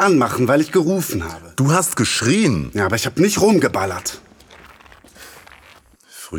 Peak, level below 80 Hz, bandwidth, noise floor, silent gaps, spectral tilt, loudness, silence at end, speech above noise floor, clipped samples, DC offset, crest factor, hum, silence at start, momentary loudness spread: -2 dBFS; -46 dBFS; over 20 kHz; -48 dBFS; none; -4.5 dB/octave; -17 LUFS; 0 s; 31 dB; under 0.1%; under 0.1%; 16 dB; none; 0 s; 11 LU